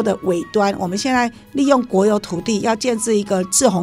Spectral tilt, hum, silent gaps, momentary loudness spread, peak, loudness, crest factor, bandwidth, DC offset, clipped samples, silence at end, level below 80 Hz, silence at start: -4 dB/octave; none; none; 6 LU; 0 dBFS; -18 LUFS; 18 dB; 16 kHz; under 0.1%; under 0.1%; 0 s; -50 dBFS; 0 s